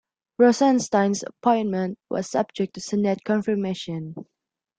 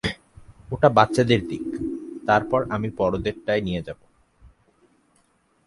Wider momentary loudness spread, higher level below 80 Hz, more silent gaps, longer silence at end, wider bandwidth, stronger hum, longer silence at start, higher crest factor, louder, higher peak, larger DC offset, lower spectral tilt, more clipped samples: about the same, 13 LU vs 14 LU; second, -66 dBFS vs -48 dBFS; neither; second, 0.55 s vs 1.2 s; second, 9.2 kHz vs 11.5 kHz; neither; first, 0.4 s vs 0.05 s; second, 18 dB vs 24 dB; about the same, -23 LUFS vs -23 LUFS; second, -6 dBFS vs 0 dBFS; neither; about the same, -5.5 dB/octave vs -6.5 dB/octave; neither